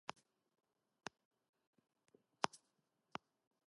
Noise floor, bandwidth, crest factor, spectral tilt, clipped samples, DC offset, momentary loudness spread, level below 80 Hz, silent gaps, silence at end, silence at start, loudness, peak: -85 dBFS; 11 kHz; 38 dB; -2.5 dB/octave; under 0.1%; under 0.1%; 12 LU; under -90 dBFS; none; 1.1 s; 2.45 s; -49 LUFS; -16 dBFS